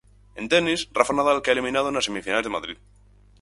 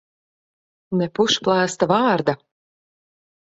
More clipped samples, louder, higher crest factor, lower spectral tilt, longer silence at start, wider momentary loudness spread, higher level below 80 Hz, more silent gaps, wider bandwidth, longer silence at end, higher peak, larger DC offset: neither; second, -23 LUFS vs -20 LUFS; about the same, 22 dB vs 20 dB; second, -3 dB/octave vs -4.5 dB/octave; second, 0.35 s vs 0.9 s; first, 13 LU vs 8 LU; first, -52 dBFS vs -62 dBFS; neither; first, 11.5 kHz vs 8.2 kHz; second, 0.65 s vs 1.1 s; about the same, -2 dBFS vs -4 dBFS; neither